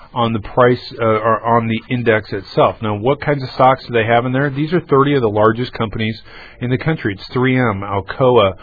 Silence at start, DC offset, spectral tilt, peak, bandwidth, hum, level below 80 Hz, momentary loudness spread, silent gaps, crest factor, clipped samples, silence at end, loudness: 0.15 s; under 0.1%; -9.5 dB/octave; 0 dBFS; 4.9 kHz; none; -42 dBFS; 8 LU; none; 16 dB; under 0.1%; 0.05 s; -16 LUFS